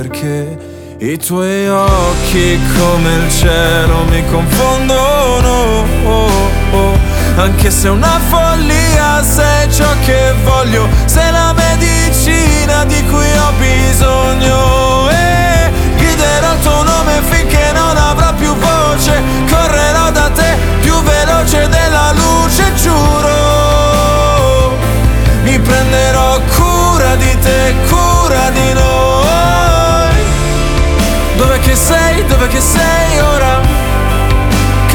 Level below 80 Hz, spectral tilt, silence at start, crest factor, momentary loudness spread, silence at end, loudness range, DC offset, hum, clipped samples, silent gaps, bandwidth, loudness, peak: -14 dBFS; -4.5 dB/octave; 0 s; 8 dB; 3 LU; 0 s; 1 LU; under 0.1%; none; under 0.1%; none; 20 kHz; -10 LUFS; 0 dBFS